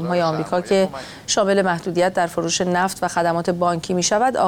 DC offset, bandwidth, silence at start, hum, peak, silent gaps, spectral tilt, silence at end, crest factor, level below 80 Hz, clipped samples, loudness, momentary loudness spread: under 0.1%; 18 kHz; 0 s; none; -6 dBFS; none; -4 dB/octave; 0 s; 14 dB; -54 dBFS; under 0.1%; -20 LUFS; 4 LU